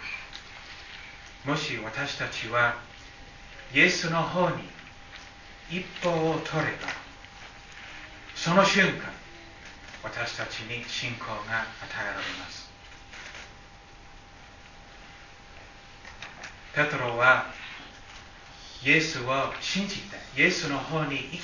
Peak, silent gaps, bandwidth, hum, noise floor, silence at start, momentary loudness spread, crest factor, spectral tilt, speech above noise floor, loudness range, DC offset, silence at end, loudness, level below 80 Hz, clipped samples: -6 dBFS; none; 7.4 kHz; none; -49 dBFS; 0 s; 25 LU; 24 dB; -4 dB/octave; 22 dB; 12 LU; under 0.1%; 0 s; -27 LUFS; -54 dBFS; under 0.1%